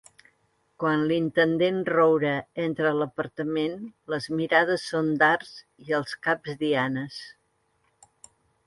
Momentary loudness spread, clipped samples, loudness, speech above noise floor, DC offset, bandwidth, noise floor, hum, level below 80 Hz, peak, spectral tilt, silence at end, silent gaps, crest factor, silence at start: 11 LU; under 0.1%; -25 LUFS; 45 dB; under 0.1%; 11.5 kHz; -71 dBFS; none; -68 dBFS; -6 dBFS; -6 dB/octave; 1.35 s; none; 20 dB; 0.8 s